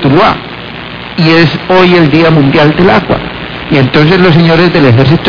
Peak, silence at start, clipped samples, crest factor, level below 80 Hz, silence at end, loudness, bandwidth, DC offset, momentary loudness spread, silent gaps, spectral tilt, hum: 0 dBFS; 0 s; 5%; 6 dB; -32 dBFS; 0 s; -6 LUFS; 5.4 kHz; 2%; 14 LU; none; -8 dB/octave; none